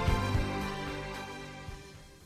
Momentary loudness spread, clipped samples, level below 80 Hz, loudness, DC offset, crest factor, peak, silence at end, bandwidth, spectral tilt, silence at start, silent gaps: 16 LU; under 0.1%; -40 dBFS; -36 LUFS; under 0.1%; 16 dB; -18 dBFS; 0 s; 15 kHz; -5.5 dB/octave; 0 s; none